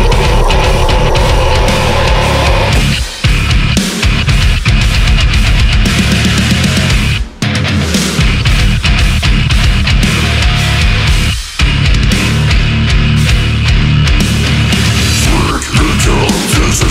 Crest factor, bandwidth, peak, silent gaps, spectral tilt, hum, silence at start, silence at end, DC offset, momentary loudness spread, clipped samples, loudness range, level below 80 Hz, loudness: 8 dB; 16 kHz; 0 dBFS; none; -4.5 dB/octave; none; 0 s; 0 s; under 0.1%; 2 LU; under 0.1%; 1 LU; -12 dBFS; -10 LUFS